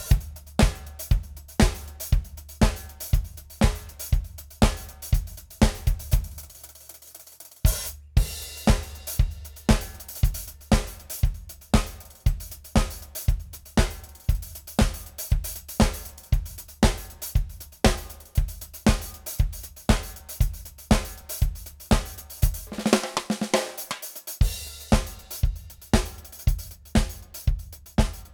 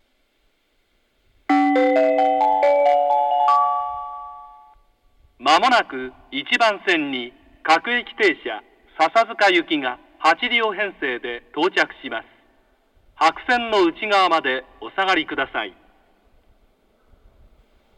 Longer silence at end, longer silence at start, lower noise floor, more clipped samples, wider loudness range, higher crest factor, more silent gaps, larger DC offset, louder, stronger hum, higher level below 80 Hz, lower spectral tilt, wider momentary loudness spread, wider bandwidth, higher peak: second, 0.1 s vs 2.3 s; second, 0 s vs 1.5 s; second, -47 dBFS vs -65 dBFS; neither; about the same, 2 LU vs 4 LU; about the same, 22 dB vs 20 dB; neither; neither; second, -27 LUFS vs -19 LUFS; neither; first, -28 dBFS vs -58 dBFS; first, -5 dB/octave vs -3 dB/octave; about the same, 12 LU vs 14 LU; first, over 20 kHz vs 12 kHz; about the same, -2 dBFS vs -2 dBFS